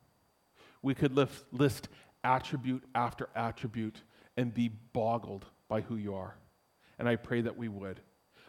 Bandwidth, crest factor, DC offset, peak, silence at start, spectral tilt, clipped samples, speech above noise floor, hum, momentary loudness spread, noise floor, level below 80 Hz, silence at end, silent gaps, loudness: 16.5 kHz; 22 dB; under 0.1%; -12 dBFS; 0.85 s; -7 dB/octave; under 0.1%; 37 dB; none; 13 LU; -71 dBFS; -64 dBFS; 0.5 s; none; -35 LUFS